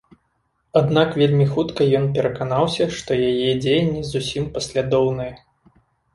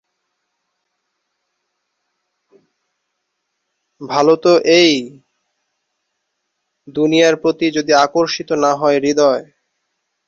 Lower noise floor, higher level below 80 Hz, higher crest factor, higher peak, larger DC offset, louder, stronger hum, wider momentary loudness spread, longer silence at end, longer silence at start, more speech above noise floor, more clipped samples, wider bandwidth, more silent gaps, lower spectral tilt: second, -69 dBFS vs -73 dBFS; first, -48 dBFS vs -62 dBFS; about the same, 18 dB vs 16 dB; about the same, -2 dBFS vs -2 dBFS; neither; second, -20 LUFS vs -14 LUFS; neither; second, 7 LU vs 10 LU; about the same, 0.75 s vs 0.85 s; second, 0.75 s vs 4 s; second, 49 dB vs 60 dB; neither; first, 11.5 kHz vs 7.8 kHz; neither; first, -6.5 dB/octave vs -4 dB/octave